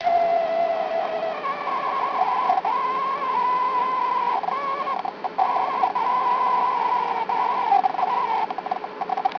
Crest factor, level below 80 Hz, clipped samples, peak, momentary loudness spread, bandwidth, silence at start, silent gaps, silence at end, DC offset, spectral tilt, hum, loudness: 16 dB; -66 dBFS; under 0.1%; -8 dBFS; 6 LU; 5.4 kHz; 0 s; none; 0 s; under 0.1%; -4.5 dB/octave; none; -23 LUFS